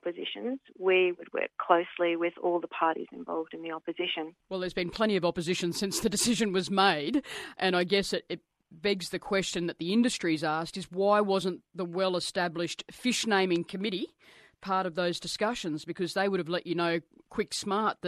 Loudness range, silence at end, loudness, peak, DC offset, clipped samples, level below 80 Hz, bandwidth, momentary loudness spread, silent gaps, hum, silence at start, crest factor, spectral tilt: 3 LU; 0 s; -30 LUFS; -8 dBFS; under 0.1%; under 0.1%; -64 dBFS; 13.5 kHz; 10 LU; none; none; 0.05 s; 22 dB; -4 dB/octave